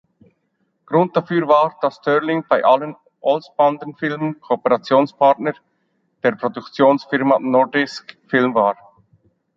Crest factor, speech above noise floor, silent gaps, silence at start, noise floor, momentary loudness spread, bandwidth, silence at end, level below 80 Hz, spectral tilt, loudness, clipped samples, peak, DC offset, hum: 18 dB; 51 dB; none; 0.9 s; -68 dBFS; 10 LU; 7.6 kHz; 0.85 s; -68 dBFS; -7 dB/octave; -18 LUFS; under 0.1%; -2 dBFS; under 0.1%; none